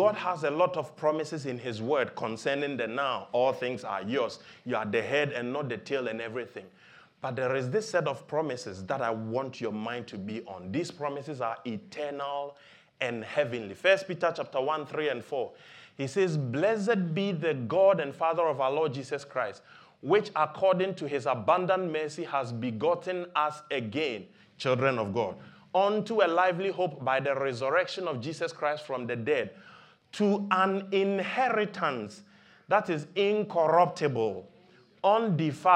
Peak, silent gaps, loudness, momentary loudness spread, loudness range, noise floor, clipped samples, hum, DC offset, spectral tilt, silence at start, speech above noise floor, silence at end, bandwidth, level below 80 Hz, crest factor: -8 dBFS; none; -29 LUFS; 10 LU; 5 LU; -59 dBFS; under 0.1%; none; under 0.1%; -6 dB/octave; 0 s; 30 dB; 0 s; 10.5 kHz; -80 dBFS; 22 dB